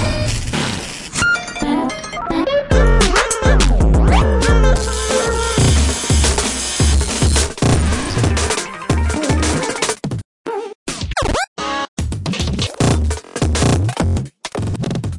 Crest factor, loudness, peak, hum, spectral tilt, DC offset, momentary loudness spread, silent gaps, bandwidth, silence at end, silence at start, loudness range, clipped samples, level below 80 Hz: 14 dB; -17 LUFS; -2 dBFS; none; -4.5 dB/octave; under 0.1%; 9 LU; 10.25-10.45 s, 10.75-10.86 s, 11.48-11.56 s, 11.88-11.97 s; 11.5 kHz; 0 s; 0 s; 6 LU; under 0.1%; -20 dBFS